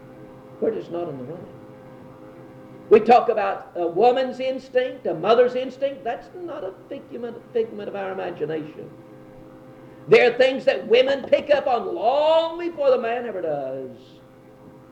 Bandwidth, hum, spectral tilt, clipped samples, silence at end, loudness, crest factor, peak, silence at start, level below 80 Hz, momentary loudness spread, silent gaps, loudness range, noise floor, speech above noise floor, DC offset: 8.4 kHz; none; -5.5 dB/octave; under 0.1%; 0.2 s; -21 LUFS; 20 dB; -4 dBFS; 0 s; -64 dBFS; 18 LU; none; 11 LU; -47 dBFS; 26 dB; under 0.1%